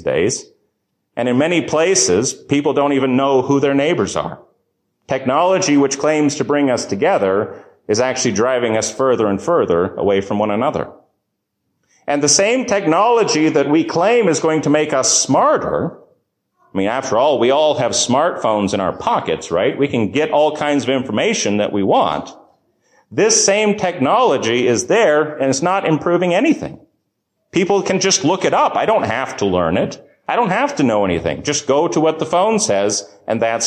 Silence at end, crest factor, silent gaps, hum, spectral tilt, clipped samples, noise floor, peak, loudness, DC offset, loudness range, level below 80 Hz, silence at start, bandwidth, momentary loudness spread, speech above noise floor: 0 s; 14 dB; none; none; -3.5 dB/octave; under 0.1%; -73 dBFS; -2 dBFS; -16 LUFS; under 0.1%; 3 LU; -50 dBFS; 0 s; 11 kHz; 7 LU; 58 dB